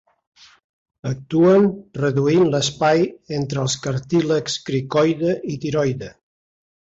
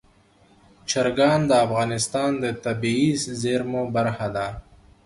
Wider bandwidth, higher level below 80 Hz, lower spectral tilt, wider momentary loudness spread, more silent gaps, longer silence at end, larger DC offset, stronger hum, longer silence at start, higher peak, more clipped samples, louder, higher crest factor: second, 8 kHz vs 11.5 kHz; about the same, -54 dBFS vs -52 dBFS; about the same, -5.5 dB/octave vs -5 dB/octave; about the same, 10 LU vs 8 LU; neither; first, 0.85 s vs 0.45 s; neither; neither; first, 1.05 s vs 0.85 s; about the same, -6 dBFS vs -6 dBFS; neither; first, -19 LUFS vs -23 LUFS; about the same, 16 dB vs 18 dB